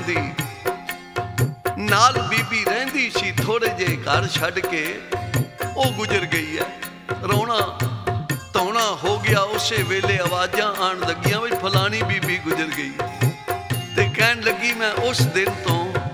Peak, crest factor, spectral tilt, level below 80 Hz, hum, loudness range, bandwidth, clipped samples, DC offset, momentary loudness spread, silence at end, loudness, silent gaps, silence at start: 0 dBFS; 20 dB; -4.5 dB/octave; -50 dBFS; none; 3 LU; 19.5 kHz; under 0.1%; under 0.1%; 8 LU; 0 s; -21 LUFS; none; 0 s